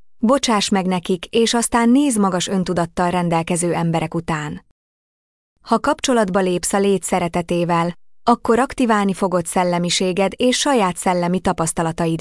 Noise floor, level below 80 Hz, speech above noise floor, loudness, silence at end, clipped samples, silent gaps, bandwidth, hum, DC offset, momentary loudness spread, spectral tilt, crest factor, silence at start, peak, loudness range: under -90 dBFS; -46 dBFS; over 72 dB; -18 LUFS; 0 s; under 0.1%; 4.71-5.56 s; 12 kHz; none; under 0.1%; 5 LU; -4.5 dB/octave; 16 dB; 0.2 s; -4 dBFS; 4 LU